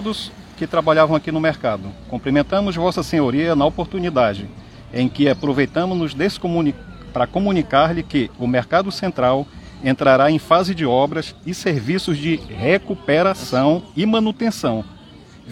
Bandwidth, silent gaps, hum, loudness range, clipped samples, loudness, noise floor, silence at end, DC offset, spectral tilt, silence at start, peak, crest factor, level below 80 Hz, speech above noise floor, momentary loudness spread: 14.5 kHz; none; none; 2 LU; under 0.1%; -19 LUFS; -42 dBFS; 0 s; under 0.1%; -6.5 dB/octave; 0 s; 0 dBFS; 18 dB; -44 dBFS; 24 dB; 11 LU